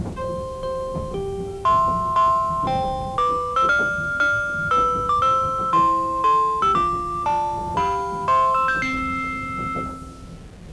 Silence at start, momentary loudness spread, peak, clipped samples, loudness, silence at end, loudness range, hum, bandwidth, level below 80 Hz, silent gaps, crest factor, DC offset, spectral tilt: 0 s; 10 LU; -8 dBFS; under 0.1%; -21 LUFS; 0 s; 3 LU; none; 11 kHz; -40 dBFS; none; 14 dB; under 0.1%; -5.5 dB/octave